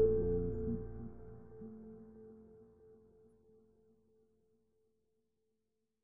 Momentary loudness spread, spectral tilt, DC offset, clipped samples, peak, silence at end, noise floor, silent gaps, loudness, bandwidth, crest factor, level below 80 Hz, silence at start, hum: 25 LU; -11 dB/octave; under 0.1%; under 0.1%; -20 dBFS; 0 s; -86 dBFS; none; -40 LUFS; 1.9 kHz; 22 dB; -54 dBFS; 0 s; none